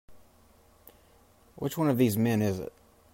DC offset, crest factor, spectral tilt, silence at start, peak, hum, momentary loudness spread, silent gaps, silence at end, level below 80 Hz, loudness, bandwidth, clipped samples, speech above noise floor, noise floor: under 0.1%; 18 dB; -6.5 dB/octave; 0.1 s; -12 dBFS; none; 12 LU; none; 0.45 s; -64 dBFS; -28 LUFS; 16 kHz; under 0.1%; 34 dB; -60 dBFS